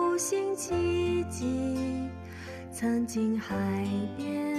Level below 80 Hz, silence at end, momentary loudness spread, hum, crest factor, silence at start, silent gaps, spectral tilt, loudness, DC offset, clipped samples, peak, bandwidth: -56 dBFS; 0 s; 11 LU; none; 12 dB; 0 s; none; -5.5 dB/octave; -31 LUFS; under 0.1%; under 0.1%; -18 dBFS; 13.5 kHz